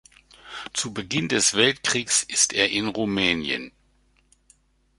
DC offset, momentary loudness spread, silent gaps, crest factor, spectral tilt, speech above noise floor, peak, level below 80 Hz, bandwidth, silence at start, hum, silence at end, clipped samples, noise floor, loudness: under 0.1%; 11 LU; none; 22 dB; -2 dB/octave; 40 dB; -4 dBFS; -56 dBFS; 11.5 kHz; 0.45 s; none; 1.3 s; under 0.1%; -63 dBFS; -22 LUFS